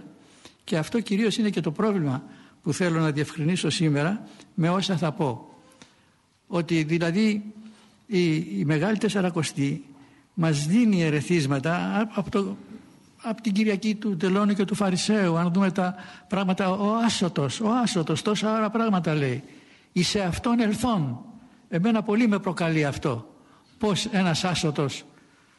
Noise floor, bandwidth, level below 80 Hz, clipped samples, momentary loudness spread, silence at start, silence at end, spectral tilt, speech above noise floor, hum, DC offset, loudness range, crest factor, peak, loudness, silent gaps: -62 dBFS; 11.5 kHz; -56 dBFS; under 0.1%; 8 LU; 0 s; 0.55 s; -5.5 dB/octave; 38 dB; none; under 0.1%; 3 LU; 14 dB; -12 dBFS; -25 LUFS; none